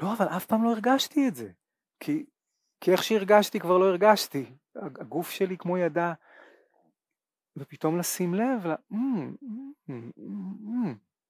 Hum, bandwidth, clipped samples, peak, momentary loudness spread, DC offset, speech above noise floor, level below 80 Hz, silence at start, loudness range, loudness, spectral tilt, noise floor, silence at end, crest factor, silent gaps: none; 16 kHz; under 0.1%; -8 dBFS; 19 LU; under 0.1%; over 63 dB; -80 dBFS; 0 s; 7 LU; -27 LUFS; -5 dB/octave; under -90 dBFS; 0.35 s; 20 dB; none